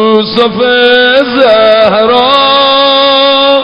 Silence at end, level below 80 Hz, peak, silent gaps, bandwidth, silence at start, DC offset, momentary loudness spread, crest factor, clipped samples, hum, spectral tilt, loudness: 0 s; -42 dBFS; 0 dBFS; none; 6.4 kHz; 0 s; under 0.1%; 3 LU; 6 dB; 0.7%; none; -5.5 dB/octave; -5 LUFS